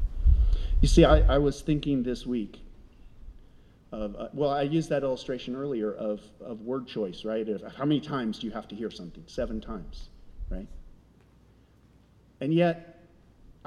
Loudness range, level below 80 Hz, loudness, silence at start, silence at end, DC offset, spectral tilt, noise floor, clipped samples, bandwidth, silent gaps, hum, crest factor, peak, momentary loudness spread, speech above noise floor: 13 LU; -32 dBFS; -28 LUFS; 0 s; 0.75 s; under 0.1%; -7 dB/octave; -59 dBFS; under 0.1%; 10.5 kHz; none; none; 22 dB; -6 dBFS; 17 LU; 31 dB